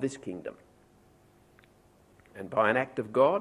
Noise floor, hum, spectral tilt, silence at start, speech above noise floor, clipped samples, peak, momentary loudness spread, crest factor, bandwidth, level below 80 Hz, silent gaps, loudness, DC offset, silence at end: -61 dBFS; 50 Hz at -65 dBFS; -6 dB/octave; 0 s; 33 dB; under 0.1%; -10 dBFS; 19 LU; 22 dB; 11 kHz; -68 dBFS; none; -29 LUFS; under 0.1%; 0 s